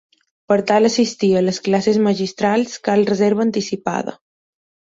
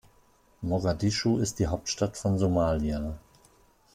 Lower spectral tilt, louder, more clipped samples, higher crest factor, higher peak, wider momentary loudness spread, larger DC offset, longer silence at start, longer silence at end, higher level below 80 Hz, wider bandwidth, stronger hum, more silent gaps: about the same, -5.5 dB/octave vs -5.5 dB/octave; first, -17 LUFS vs -28 LUFS; neither; about the same, 16 dB vs 16 dB; first, -2 dBFS vs -12 dBFS; second, 7 LU vs 10 LU; neither; about the same, 0.5 s vs 0.6 s; about the same, 0.7 s vs 0.75 s; second, -60 dBFS vs -44 dBFS; second, 7.8 kHz vs 15.5 kHz; neither; neither